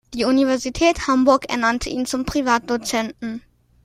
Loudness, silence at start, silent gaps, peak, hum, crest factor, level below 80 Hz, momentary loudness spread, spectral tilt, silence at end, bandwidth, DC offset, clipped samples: -19 LUFS; 0.1 s; none; -4 dBFS; none; 16 dB; -42 dBFS; 10 LU; -3.5 dB/octave; 0.45 s; 15.5 kHz; under 0.1%; under 0.1%